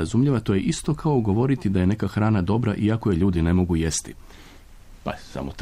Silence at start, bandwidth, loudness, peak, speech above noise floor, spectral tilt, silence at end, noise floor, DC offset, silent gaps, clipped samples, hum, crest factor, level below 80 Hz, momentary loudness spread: 0 s; 14.5 kHz; -22 LUFS; -10 dBFS; 23 dB; -6.5 dB/octave; 0 s; -45 dBFS; under 0.1%; none; under 0.1%; none; 12 dB; -40 dBFS; 12 LU